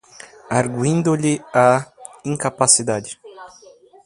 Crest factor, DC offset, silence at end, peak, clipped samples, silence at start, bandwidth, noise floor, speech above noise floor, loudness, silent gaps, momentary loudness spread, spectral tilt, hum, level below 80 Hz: 20 dB; under 0.1%; 0.6 s; 0 dBFS; under 0.1%; 0.5 s; 11.5 kHz; -47 dBFS; 29 dB; -18 LUFS; none; 18 LU; -4 dB/octave; none; -58 dBFS